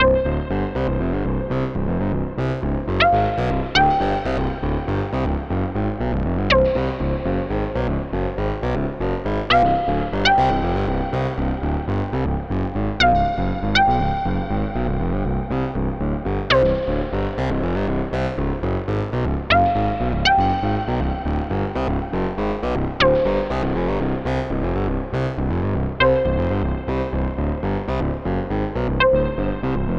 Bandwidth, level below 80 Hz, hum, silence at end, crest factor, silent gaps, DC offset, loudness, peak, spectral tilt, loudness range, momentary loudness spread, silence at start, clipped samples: 7.6 kHz; -28 dBFS; none; 0 s; 16 dB; none; under 0.1%; -21 LUFS; -4 dBFS; -7 dB/octave; 2 LU; 7 LU; 0 s; under 0.1%